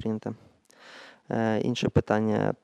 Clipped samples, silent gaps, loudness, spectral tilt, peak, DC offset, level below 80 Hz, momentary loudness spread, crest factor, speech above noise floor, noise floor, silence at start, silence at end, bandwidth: under 0.1%; none; -27 LUFS; -7 dB/octave; -8 dBFS; under 0.1%; -52 dBFS; 22 LU; 20 dB; 27 dB; -53 dBFS; 0 s; 0.1 s; 9.8 kHz